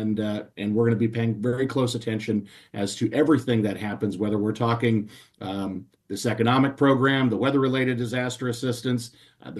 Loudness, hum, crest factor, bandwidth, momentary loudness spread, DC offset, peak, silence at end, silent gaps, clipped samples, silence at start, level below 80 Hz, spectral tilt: -24 LUFS; none; 16 dB; 12.5 kHz; 11 LU; under 0.1%; -8 dBFS; 0 s; none; under 0.1%; 0 s; -62 dBFS; -6.5 dB/octave